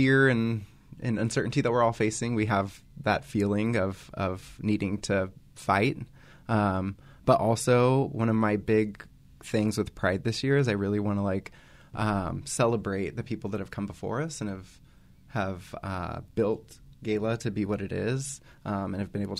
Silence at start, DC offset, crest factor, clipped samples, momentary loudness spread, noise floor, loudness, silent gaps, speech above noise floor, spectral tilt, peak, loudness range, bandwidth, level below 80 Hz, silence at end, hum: 0 s; under 0.1%; 20 dB; under 0.1%; 12 LU; -55 dBFS; -28 LUFS; none; 28 dB; -6 dB/octave; -8 dBFS; 7 LU; 14 kHz; -54 dBFS; 0 s; none